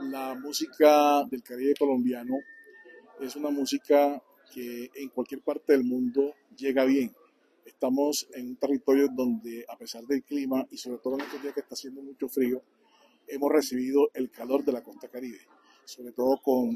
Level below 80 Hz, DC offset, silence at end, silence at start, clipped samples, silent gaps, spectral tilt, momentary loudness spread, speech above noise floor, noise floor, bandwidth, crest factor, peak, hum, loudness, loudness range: -78 dBFS; under 0.1%; 0 s; 0 s; under 0.1%; none; -4 dB/octave; 17 LU; 35 dB; -63 dBFS; 14.5 kHz; 20 dB; -8 dBFS; none; -28 LUFS; 6 LU